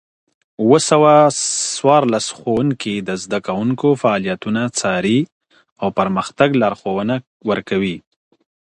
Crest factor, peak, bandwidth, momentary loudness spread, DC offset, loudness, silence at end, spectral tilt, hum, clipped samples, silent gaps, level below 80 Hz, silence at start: 16 dB; 0 dBFS; 11.5 kHz; 10 LU; under 0.1%; -17 LUFS; 0.65 s; -4.5 dB/octave; none; under 0.1%; 5.32-5.41 s, 5.72-5.76 s, 7.27-7.40 s; -56 dBFS; 0.6 s